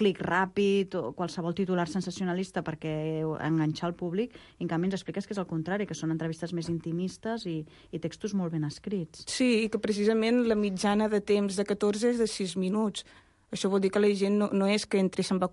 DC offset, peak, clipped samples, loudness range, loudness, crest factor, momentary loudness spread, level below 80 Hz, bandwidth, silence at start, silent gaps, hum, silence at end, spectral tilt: under 0.1%; -12 dBFS; under 0.1%; 6 LU; -29 LUFS; 16 dB; 9 LU; -62 dBFS; 11.5 kHz; 0 s; none; none; 0 s; -5.5 dB/octave